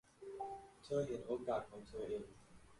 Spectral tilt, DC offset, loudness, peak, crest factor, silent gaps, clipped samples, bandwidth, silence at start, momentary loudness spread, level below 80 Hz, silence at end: -6.5 dB/octave; under 0.1%; -45 LUFS; -28 dBFS; 18 dB; none; under 0.1%; 11.5 kHz; 0.2 s; 13 LU; -68 dBFS; 0 s